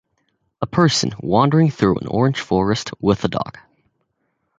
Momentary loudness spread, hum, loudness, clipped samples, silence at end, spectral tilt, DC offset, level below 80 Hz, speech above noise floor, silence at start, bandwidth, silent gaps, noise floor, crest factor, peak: 8 LU; none; -18 LUFS; under 0.1%; 1.1 s; -6 dB/octave; under 0.1%; -46 dBFS; 53 dB; 0.6 s; 9.2 kHz; none; -71 dBFS; 18 dB; -2 dBFS